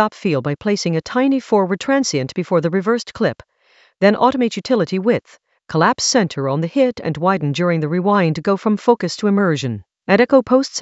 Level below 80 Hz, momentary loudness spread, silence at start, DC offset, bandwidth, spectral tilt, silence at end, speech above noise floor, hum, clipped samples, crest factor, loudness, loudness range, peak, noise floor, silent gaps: -58 dBFS; 7 LU; 0 s; under 0.1%; 8.2 kHz; -5.5 dB/octave; 0 s; 38 dB; none; under 0.1%; 18 dB; -17 LUFS; 2 LU; 0 dBFS; -55 dBFS; none